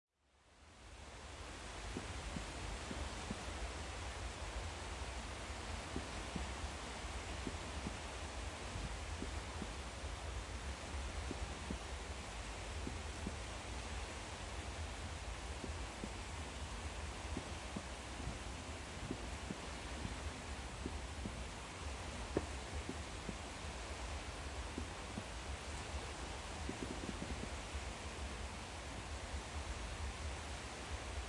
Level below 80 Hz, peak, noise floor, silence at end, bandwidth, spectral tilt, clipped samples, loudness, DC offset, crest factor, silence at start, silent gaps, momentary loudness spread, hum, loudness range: -50 dBFS; -22 dBFS; -71 dBFS; 0 s; 11.5 kHz; -4 dB/octave; under 0.1%; -46 LUFS; under 0.1%; 24 dB; 0.45 s; none; 2 LU; none; 1 LU